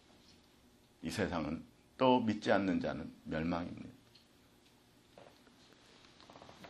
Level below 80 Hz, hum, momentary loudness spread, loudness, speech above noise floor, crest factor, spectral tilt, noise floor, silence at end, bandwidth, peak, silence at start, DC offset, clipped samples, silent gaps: -64 dBFS; none; 25 LU; -36 LUFS; 31 dB; 24 dB; -6 dB/octave; -66 dBFS; 0 s; 13 kHz; -14 dBFS; 1 s; under 0.1%; under 0.1%; none